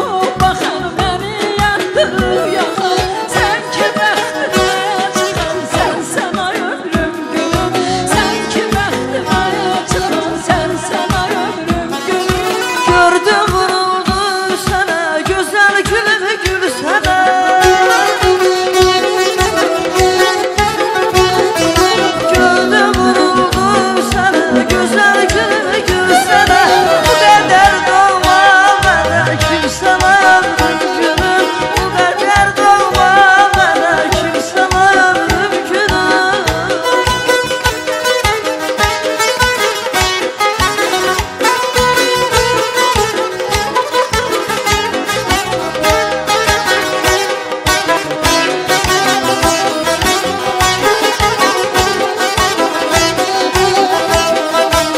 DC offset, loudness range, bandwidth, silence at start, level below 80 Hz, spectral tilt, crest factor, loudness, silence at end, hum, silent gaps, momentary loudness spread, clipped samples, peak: under 0.1%; 5 LU; 16 kHz; 0 s; -30 dBFS; -3 dB/octave; 12 dB; -12 LUFS; 0 s; none; none; 7 LU; under 0.1%; 0 dBFS